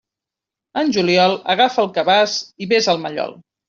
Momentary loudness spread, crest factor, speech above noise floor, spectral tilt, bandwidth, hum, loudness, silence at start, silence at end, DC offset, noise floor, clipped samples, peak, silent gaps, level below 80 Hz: 11 LU; 16 dB; 69 dB; -4 dB/octave; 7.6 kHz; none; -17 LUFS; 0.75 s; 0.35 s; under 0.1%; -86 dBFS; under 0.1%; -2 dBFS; none; -64 dBFS